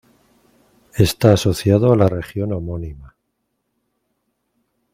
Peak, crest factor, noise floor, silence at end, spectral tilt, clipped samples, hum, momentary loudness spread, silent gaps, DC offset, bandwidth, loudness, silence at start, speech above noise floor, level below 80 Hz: 0 dBFS; 20 dB; -73 dBFS; 1.9 s; -6.5 dB/octave; under 0.1%; none; 16 LU; none; under 0.1%; 16 kHz; -17 LUFS; 0.95 s; 56 dB; -42 dBFS